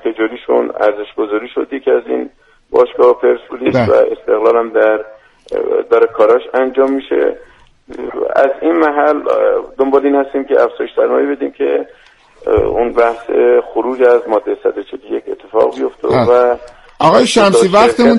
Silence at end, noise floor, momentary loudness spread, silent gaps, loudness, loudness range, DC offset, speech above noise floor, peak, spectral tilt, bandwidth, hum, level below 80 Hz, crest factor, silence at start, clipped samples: 0 s; -38 dBFS; 11 LU; none; -13 LUFS; 2 LU; under 0.1%; 26 dB; 0 dBFS; -5.5 dB/octave; 11.5 kHz; none; -42 dBFS; 12 dB; 0.05 s; under 0.1%